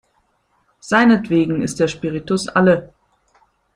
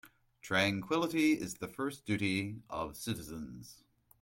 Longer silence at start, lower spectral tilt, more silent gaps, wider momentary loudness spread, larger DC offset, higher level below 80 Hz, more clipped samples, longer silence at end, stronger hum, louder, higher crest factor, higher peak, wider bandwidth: first, 0.85 s vs 0.05 s; first, -6 dB/octave vs -4.5 dB/octave; neither; second, 8 LU vs 16 LU; neither; first, -52 dBFS vs -64 dBFS; neither; first, 0.9 s vs 0.45 s; neither; first, -17 LUFS vs -34 LUFS; about the same, 18 dB vs 20 dB; first, 0 dBFS vs -16 dBFS; second, 11 kHz vs 16.5 kHz